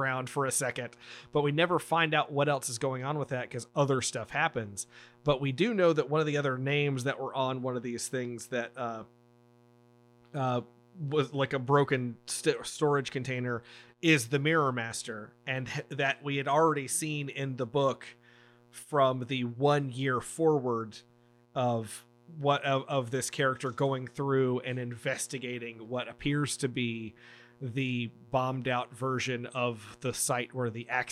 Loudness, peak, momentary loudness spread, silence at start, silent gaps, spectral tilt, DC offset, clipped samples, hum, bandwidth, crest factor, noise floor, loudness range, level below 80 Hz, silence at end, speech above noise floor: -31 LUFS; -10 dBFS; 11 LU; 0 s; none; -4.5 dB/octave; under 0.1%; under 0.1%; none; 15 kHz; 20 dB; -62 dBFS; 5 LU; -68 dBFS; 0 s; 31 dB